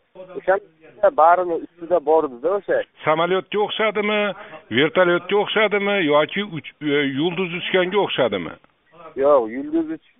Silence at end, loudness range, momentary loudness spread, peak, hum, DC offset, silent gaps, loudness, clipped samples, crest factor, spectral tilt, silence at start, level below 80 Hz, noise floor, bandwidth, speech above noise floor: 0.2 s; 2 LU; 9 LU; -2 dBFS; none; under 0.1%; none; -20 LUFS; under 0.1%; 18 dB; -2.5 dB/octave; 0.15 s; -62 dBFS; -45 dBFS; 3.9 kHz; 25 dB